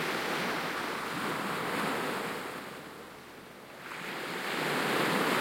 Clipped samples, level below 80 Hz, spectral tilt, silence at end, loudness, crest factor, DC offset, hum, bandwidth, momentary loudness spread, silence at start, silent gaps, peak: under 0.1%; -72 dBFS; -3.5 dB/octave; 0 s; -33 LUFS; 18 dB; under 0.1%; none; 16.5 kHz; 18 LU; 0 s; none; -16 dBFS